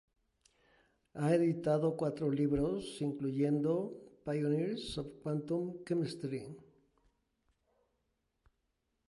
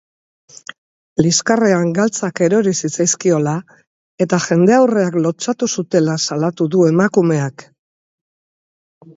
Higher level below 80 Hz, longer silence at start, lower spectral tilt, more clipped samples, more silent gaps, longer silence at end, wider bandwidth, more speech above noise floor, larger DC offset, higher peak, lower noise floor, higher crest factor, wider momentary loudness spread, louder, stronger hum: about the same, -62 dBFS vs -58 dBFS; about the same, 1.15 s vs 1.2 s; first, -7.5 dB/octave vs -5 dB/octave; neither; second, none vs 3.87-4.18 s; first, 2.45 s vs 1.55 s; first, 11.5 kHz vs 8 kHz; second, 48 dB vs over 75 dB; neither; second, -18 dBFS vs 0 dBFS; second, -82 dBFS vs under -90 dBFS; about the same, 18 dB vs 16 dB; about the same, 11 LU vs 10 LU; second, -35 LUFS vs -15 LUFS; neither